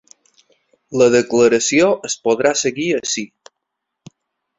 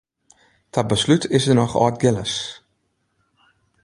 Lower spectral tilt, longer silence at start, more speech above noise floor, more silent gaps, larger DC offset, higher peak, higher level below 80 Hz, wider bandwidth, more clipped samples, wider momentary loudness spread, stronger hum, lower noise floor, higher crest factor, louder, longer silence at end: second, -3.5 dB/octave vs -5.5 dB/octave; first, 0.9 s vs 0.75 s; first, 63 dB vs 51 dB; neither; neither; about the same, -2 dBFS vs -2 dBFS; second, -58 dBFS vs -50 dBFS; second, 8.2 kHz vs 11.5 kHz; neither; about the same, 10 LU vs 10 LU; neither; first, -78 dBFS vs -69 dBFS; about the same, 16 dB vs 20 dB; first, -16 LUFS vs -19 LUFS; about the same, 1.3 s vs 1.3 s